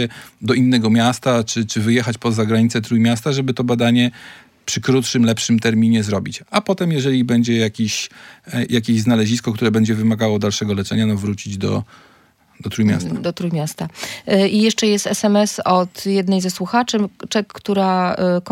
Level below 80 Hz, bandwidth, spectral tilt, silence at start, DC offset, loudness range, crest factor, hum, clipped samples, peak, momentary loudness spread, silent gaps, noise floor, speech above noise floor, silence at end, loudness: -60 dBFS; 16 kHz; -5 dB/octave; 0 s; under 0.1%; 3 LU; 16 dB; none; under 0.1%; -2 dBFS; 8 LU; none; -53 dBFS; 36 dB; 0 s; -18 LUFS